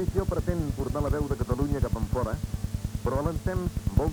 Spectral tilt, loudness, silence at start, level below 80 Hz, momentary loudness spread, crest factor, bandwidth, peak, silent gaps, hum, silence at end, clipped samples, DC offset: -7.5 dB/octave; -30 LUFS; 0 s; -34 dBFS; 4 LU; 18 dB; over 20 kHz; -10 dBFS; none; none; 0 s; under 0.1%; under 0.1%